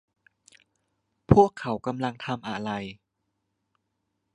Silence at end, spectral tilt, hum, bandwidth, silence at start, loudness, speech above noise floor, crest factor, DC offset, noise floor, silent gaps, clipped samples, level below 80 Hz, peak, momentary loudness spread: 1.4 s; -7.5 dB/octave; none; 10.5 kHz; 1.3 s; -25 LUFS; 54 dB; 26 dB; under 0.1%; -79 dBFS; none; under 0.1%; -48 dBFS; -2 dBFS; 14 LU